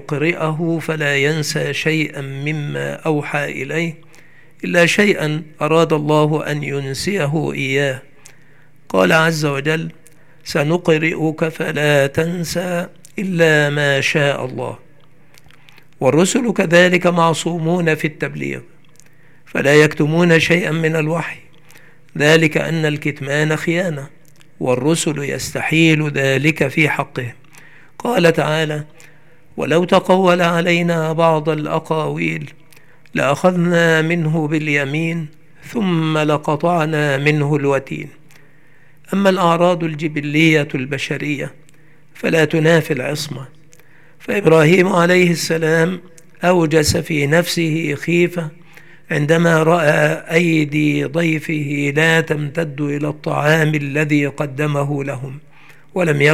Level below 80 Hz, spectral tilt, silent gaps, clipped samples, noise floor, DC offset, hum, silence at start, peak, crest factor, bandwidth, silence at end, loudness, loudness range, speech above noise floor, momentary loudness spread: -54 dBFS; -5.5 dB/octave; none; under 0.1%; -51 dBFS; 0.8%; none; 0 s; 0 dBFS; 16 dB; 15.5 kHz; 0 s; -16 LUFS; 3 LU; 35 dB; 12 LU